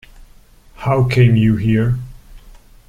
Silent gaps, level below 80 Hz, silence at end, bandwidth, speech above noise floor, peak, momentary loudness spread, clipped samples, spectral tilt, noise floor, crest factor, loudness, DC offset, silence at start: none; -36 dBFS; 0.3 s; 9.8 kHz; 32 dB; -2 dBFS; 13 LU; under 0.1%; -8.5 dB/octave; -45 dBFS; 14 dB; -15 LUFS; under 0.1%; 0.8 s